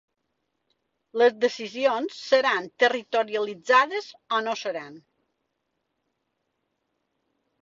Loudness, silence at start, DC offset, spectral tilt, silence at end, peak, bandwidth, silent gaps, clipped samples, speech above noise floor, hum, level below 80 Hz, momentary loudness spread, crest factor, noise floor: -24 LUFS; 1.15 s; under 0.1%; -2.5 dB/octave; 2.65 s; -6 dBFS; 7.6 kHz; none; under 0.1%; 54 dB; none; -76 dBFS; 12 LU; 22 dB; -78 dBFS